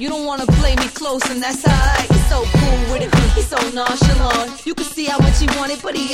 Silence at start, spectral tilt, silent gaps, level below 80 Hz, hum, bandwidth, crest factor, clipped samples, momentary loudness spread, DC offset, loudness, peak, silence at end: 0 s; -5 dB/octave; none; -20 dBFS; none; 15.5 kHz; 14 dB; under 0.1%; 7 LU; under 0.1%; -17 LUFS; 0 dBFS; 0 s